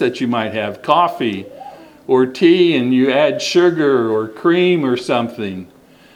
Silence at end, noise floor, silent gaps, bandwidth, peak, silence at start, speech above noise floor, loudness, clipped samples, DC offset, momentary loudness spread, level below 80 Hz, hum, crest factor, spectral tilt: 0.5 s; -37 dBFS; none; 11.5 kHz; 0 dBFS; 0 s; 22 dB; -15 LUFS; under 0.1%; under 0.1%; 13 LU; -62 dBFS; none; 16 dB; -5.5 dB/octave